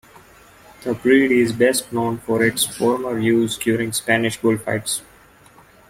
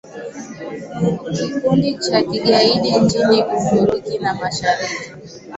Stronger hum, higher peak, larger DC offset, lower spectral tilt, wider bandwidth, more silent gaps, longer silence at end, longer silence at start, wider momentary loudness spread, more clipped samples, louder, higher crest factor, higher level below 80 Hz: neither; second, -4 dBFS vs 0 dBFS; neither; about the same, -4 dB/octave vs -5 dB/octave; first, 16.5 kHz vs 8.2 kHz; neither; first, 0.9 s vs 0 s; first, 0.8 s vs 0.05 s; second, 8 LU vs 17 LU; neither; about the same, -19 LUFS vs -17 LUFS; about the same, 18 dB vs 18 dB; second, -56 dBFS vs -50 dBFS